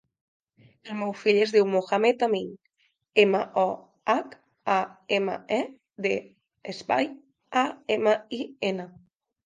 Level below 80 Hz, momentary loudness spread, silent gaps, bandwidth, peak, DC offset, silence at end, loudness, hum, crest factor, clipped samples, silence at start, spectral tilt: -76 dBFS; 15 LU; none; 9.4 kHz; -4 dBFS; under 0.1%; 0.55 s; -26 LUFS; none; 22 dB; under 0.1%; 0.85 s; -5 dB/octave